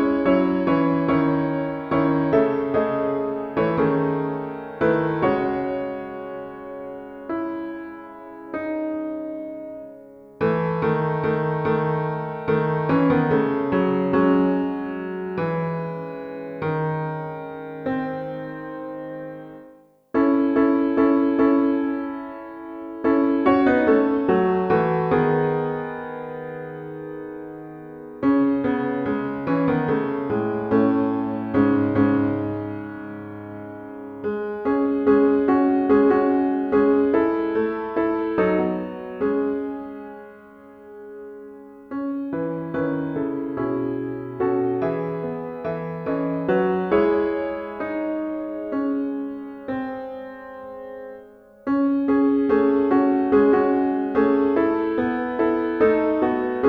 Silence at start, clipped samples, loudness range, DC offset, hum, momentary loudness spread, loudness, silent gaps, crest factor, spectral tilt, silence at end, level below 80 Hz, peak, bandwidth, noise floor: 0 s; under 0.1%; 9 LU; under 0.1%; none; 16 LU; -22 LUFS; none; 18 dB; -10 dB/octave; 0 s; -54 dBFS; -4 dBFS; 4.9 kHz; -50 dBFS